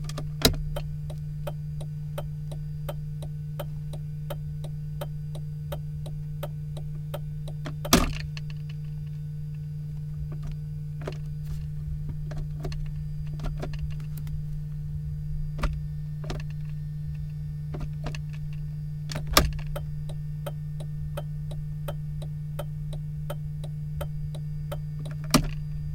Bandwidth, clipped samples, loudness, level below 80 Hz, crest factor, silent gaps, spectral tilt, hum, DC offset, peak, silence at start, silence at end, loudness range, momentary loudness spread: 17 kHz; under 0.1%; -32 LUFS; -38 dBFS; 28 dB; none; -5 dB/octave; none; under 0.1%; -2 dBFS; 0 s; 0 s; 5 LU; 10 LU